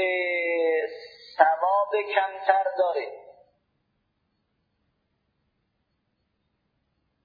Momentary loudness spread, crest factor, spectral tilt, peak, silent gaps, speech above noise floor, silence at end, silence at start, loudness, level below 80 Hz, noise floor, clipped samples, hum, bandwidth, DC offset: 13 LU; 26 dB; -4.5 dB/octave; -2 dBFS; none; 50 dB; 3.95 s; 0 s; -24 LUFS; -80 dBFS; -75 dBFS; under 0.1%; none; 5 kHz; under 0.1%